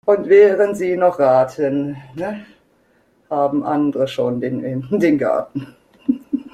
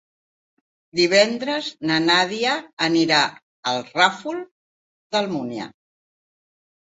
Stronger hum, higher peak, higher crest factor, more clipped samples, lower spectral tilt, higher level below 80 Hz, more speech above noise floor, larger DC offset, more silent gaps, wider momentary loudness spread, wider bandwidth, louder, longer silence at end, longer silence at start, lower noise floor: neither; about the same, -2 dBFS vs -2 dBFS; second, 16 dB vs 22 dB; neither; first, -7.5 dB/octave vs -3.5 dB/octave; first, -60 dBFS vs -68 dBFS; second, 41 dB vs over 69 dB; neither; second, none vs 2.73-2.77 s, 3.43-3.63 s, 4.51-5.10 s; about the same, 15 LU vs 13 LU; first, 12.5 kHz vs 8 kHz; about the same, -18 LUFS vs -20 LUFS; second, 0.05 s vs 1.15 s; second, 0.05 s vs 0.95 s; second, -58 dBFS vs under -90 dBFS